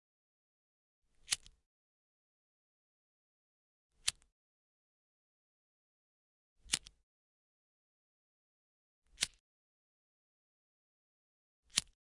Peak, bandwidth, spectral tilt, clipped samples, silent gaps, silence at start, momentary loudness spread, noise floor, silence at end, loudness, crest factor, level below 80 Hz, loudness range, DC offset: -8 dBFS; 11 kHz; 1.5 dB/octave; under 0.1%; 1.66-3.90 s, 4.32-6.56 s, 7.03-9.02 s, 9.40-11.63 s; 1.3 s; 2 LU; under -90 dBFS; 0.3 s; -39 LUFS; 40 dB; -72 dBFS; 4 LU; under 0.1%